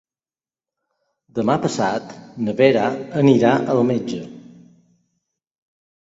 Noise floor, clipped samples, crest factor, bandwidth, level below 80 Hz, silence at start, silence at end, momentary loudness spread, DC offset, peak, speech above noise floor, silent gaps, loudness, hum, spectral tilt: under -90 dBFS; under 0.1%; 20 dB; 8 kHz; -62 dBFS; 1.35 s; 1.65 s; 15 LU; under 0.1%; -2 dBFS; over 72 dB; none; -19 LUFS; none; -6.5 dB/octave